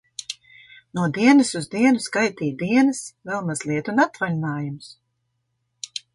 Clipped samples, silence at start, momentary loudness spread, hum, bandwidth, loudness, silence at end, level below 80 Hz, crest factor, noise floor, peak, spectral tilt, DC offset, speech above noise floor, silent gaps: under 0.1%; 0.2 s; 17 LU; none; 11.5 kHz; -21 LUFS; 0.3 s; -66 dBFS; 20 dB; -74 dBFS; -4 dBFS; -5 dB/octave; under 0.1%; 53 dB; none